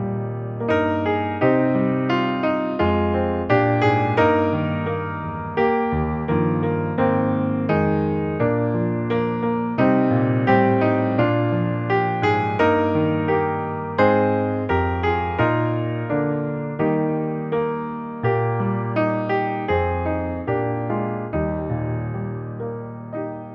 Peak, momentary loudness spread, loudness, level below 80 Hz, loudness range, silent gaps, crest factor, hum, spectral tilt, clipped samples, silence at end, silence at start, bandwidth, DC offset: -4 dBFS; 8 LU; -21 LUFS; -44 dBFS; 4 LU; none; 16 dB; none; -9.5 dB/octave; under 0.1%; 0 s; 0 s; 6.4 kHz; under 0.1%